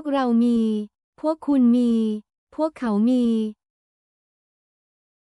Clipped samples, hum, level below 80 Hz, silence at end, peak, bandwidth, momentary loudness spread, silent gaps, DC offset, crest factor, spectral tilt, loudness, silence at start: under 0.1%; none; -62 dBFS; 1.85 s; -10 dBFS; 11 kHz; 12 LU; 1.04-1.13 s, 2.38-2.47 s; under 0.1%; 12 dB; -7.5 dB/octave; -21 LUFS; 0 s